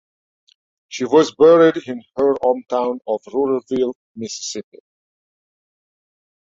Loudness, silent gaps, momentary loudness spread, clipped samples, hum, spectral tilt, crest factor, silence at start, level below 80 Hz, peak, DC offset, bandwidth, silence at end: -17 LUFS; 3.95-4.15 s; 17 LU; under 0.1%; none; -4.5 dB/octave; 18 dB; 0.9 s; -64 dBFS; -2 dBFS; under 0.1%; 7.8 kHz; 1.95 s